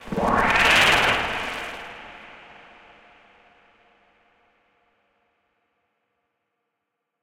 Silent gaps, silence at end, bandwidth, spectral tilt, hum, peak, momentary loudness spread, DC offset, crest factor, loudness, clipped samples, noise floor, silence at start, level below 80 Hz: none; 4.85 s; 17 kHz; -2.5 dB/octave; none; -4 dBFS; 26 LU; under 0.1%; 22 dB; -19 LUFS; under 0.1%; -80 dBFS; 0 s; -46 dBFS